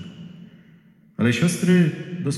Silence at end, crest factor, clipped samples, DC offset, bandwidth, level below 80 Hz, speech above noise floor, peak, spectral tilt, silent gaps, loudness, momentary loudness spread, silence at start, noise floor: 0 s; 16 dB; under 0.1%; under 0.1%; 13 kHz; -64 dBFS; 33 dB; -6 dBFS; -6 dB/octave; none; -20 LUFS; 22 LU; 0 s; -52 dBFS